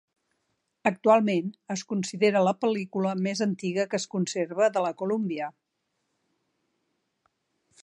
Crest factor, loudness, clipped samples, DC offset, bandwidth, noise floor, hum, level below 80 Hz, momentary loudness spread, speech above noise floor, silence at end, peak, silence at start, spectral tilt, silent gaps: 20 dB; -27 LUFS; under 0.1%; under 0.1%; 11 kHz; -79 dBFS; none; -80 dBFS; 9 LU; 53 dB; 2.35 s; -8 dBFS; 0.85 s; -5.5 dB/octave; none